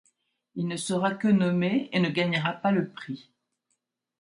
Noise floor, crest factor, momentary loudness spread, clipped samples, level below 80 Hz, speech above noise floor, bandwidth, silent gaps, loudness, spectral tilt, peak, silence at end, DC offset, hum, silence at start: -79 dBFS; 16 dB; 16 LU; under 0.1%; -70 dBFS; 53 dB; 11.5 kHz; none; -26 LUFS; -6 dB/octave; -12 dBFS; 1 s; under 0.1%; none; 0.55 s